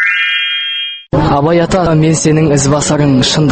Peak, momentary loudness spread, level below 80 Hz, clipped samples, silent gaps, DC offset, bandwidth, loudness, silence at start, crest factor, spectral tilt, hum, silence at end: 0 dBFS; 4 LU; -32 dBFS; under 0.1%; none; under 0.1%; 8.8 kHz; -11 LUFS; 0 s; 10 dB; -4.5 dB/octave; none; 0 s